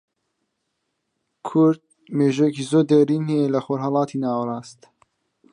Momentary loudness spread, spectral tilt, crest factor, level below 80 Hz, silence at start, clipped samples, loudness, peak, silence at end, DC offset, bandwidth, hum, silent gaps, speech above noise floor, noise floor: 12 LU; -7.5 dB/octave; 16 dB; -72 dBFS; 1.45 s; under 0.1%; -21 LUFS; -6 dBFS; 0.8 s; under 0.1%; 10.5 kHz; none; none; 56 dB; -76 dBFS